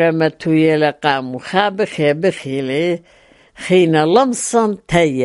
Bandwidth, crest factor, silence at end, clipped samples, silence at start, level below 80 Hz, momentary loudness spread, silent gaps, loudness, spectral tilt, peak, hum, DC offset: 11.5 kHz; 16 dB; 0 s; under 0.1%; 0 s; -50 dBFS; 8 LU; none; -16 LUFS; -5 dB/octave; 0 dBFS; none; under 0.1%